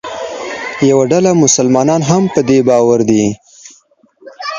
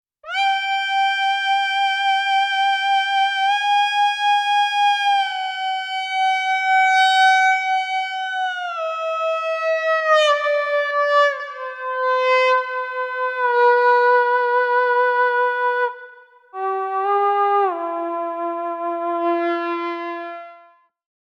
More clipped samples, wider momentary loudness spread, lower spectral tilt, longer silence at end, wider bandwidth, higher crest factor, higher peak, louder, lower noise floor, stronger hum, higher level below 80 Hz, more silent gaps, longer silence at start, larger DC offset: neither; first, 13 LU vs 10 LU; first, -5 dB/octave vs 1 dB/octave; second, 0 s vs 0.7 s; about the same, 10 kHz vs 10.5 kHz; about the same, 12 dB vs 14 dB; first, 0 dBFS vs -4 dBFS; first, -11 LUFS vs -19 LUFS; about the same, -49 dBFS vs -52 dBFS; neither; first, -50 dBFS vs -82 dBFS; neither; second, 0.05 s vs 0.25 s; neither